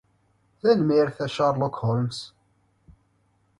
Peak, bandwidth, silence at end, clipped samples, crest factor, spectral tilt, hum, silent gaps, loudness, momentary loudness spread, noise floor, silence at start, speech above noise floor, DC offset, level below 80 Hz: -8 dBFS; 11.5 kHz; 1.3 s; under 0.1%; 18 dB; -7 dB/octave; none; none; -24 LUFS; 12 LU; -66 dBFS; 0.65 s; 44 dB; under 0.1%; -60 dBFS